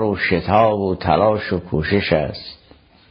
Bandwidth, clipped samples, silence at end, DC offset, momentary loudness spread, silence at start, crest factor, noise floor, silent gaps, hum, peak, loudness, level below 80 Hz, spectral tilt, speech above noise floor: 6 kHz; under 0.1%; 0.55 s; under 0.1%; 10 LU; 0 s; 18 dB; -50 dBFS; none; none; -2 dBFS; -18 LUFS; -38 dBFS; -9.5 dB/octave; 32 dB